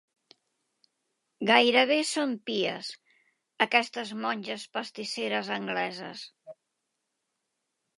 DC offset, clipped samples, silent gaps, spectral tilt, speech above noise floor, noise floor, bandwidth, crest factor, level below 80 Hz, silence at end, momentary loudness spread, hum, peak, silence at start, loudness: under 0.1%; under 0.1%; none; -3 dB/octave; 54 dB; -82 dBFS; 11.5 kHz; 26 dB; -86 dBFS; 1.45 s; 17 LU; none; -4 dBFS; 1.4 s; -27 LUFS